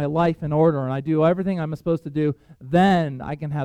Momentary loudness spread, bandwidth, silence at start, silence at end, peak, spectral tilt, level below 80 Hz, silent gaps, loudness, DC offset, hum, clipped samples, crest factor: 9 LU; 9 kHz; 0 s; 0 s; -4 dBFS; -8.5 dB/octave; -50 dBFS; none; -22 LUFS; under 0.1%; none; under 0.1%; 16 dB